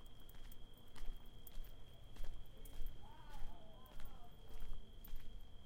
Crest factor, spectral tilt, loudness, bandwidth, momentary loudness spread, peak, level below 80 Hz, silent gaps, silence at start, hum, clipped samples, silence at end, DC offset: 14 dB; -5 dB/octave; -59 LUFS; 16 kHz; 5 LU; -30 dBFS; -50 dBFS; none; 0 s; none; under 0.1%; 0 s; under 0.1%